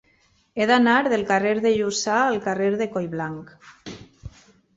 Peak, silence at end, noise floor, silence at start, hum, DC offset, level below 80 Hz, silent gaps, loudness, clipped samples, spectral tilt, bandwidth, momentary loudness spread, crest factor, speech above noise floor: -6 dBFS; 0.45 s; -62 dBFS; 0.55 s; none; under 0.1%; -56 dBFS; none; -21 LUFS; under 0.1%; -4.5 dB/octave; 8 kHz; 22 LU; 16 dB; 41 dB